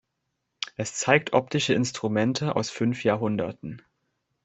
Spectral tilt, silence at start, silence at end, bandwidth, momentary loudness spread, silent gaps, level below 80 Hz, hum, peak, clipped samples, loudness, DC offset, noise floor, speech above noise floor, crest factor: -4.5 dB/octave; 0.6 s; 0.65 s; 8.4 kHz; 14 LU; none; -64 dBFS; none; -4 dBFS; under 0.1%; -25 LUFS; under 0.1%; -79 dBFS; 54 dB; 24 dB